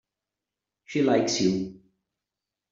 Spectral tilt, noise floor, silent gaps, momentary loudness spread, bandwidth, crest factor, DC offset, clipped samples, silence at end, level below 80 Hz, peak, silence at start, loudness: -4.5 dB/octave; -88 dBFS; none; 10 LU; 7.8 kHz; 20 dB; under 0.1%; under 0.1%; 1 s; -66 dBFS; -10 dBFS; 0.9 s; -25 LUFS